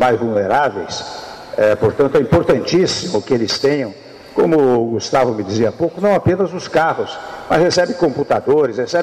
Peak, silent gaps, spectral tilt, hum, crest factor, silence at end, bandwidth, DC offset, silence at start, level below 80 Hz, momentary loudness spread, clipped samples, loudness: -6 dBFS; none; -5.5 dB/octave; none; 10 dB; 0 s; 13.5 kHz; under 0.1%; 0 s; -46 dBFS; 10 LU; under 0.1%; -16 LUFS